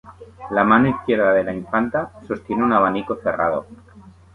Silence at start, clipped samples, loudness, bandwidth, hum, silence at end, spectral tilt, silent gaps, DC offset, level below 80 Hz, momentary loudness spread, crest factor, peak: 0.05 s; under 0.1%; -19 LUFS; 4.3 kHz; none; 0.35 s; -8.5 dB/octave; none; under 0.1%; -50 dBFS; 11 LU; 18 dB; -2 dBFS